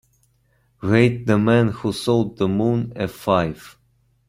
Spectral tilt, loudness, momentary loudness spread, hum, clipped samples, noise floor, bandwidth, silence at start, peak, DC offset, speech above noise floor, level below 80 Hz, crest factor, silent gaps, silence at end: -7 dB/octave; -20 LUFS; 10 LU; none; under 0.1%; -62 dBFS; 15.5 kHz; 0.8 s; -2 dBFS; under 0.1%; 43 dB; -50 dBFS; 18 dB; none; 0.6 s